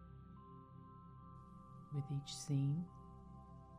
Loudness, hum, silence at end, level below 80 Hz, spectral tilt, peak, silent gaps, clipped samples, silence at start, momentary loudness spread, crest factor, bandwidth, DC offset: -43 LUFS; none; 0 s; -66 dBFS; -6.5 dB/octave; -28 dBFS; none; under 0.1%; 0 s; 19 LU; 18 dB; 11.5 kHz; under 0.1%